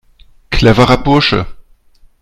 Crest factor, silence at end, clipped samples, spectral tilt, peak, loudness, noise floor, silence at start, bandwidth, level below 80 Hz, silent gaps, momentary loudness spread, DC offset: 12 dB; 0.6 s; 0.3%; -6 dB/octave; 0 dBFS; -11 LUFS; -45 dBFS; 0.5 s; 13 kHz; -26 dBFS; none; 11 LU; under 0.1%